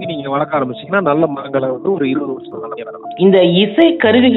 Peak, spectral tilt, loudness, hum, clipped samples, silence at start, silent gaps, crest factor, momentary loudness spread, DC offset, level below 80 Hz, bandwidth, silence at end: 0 dBFS; -9.5 dB/octave; -14 LUFS; none; under 0.1%; 0 s; none; 14 dB; 16 LU; under 0.1%; -62 dBFS; 4.1 kHz; 0 s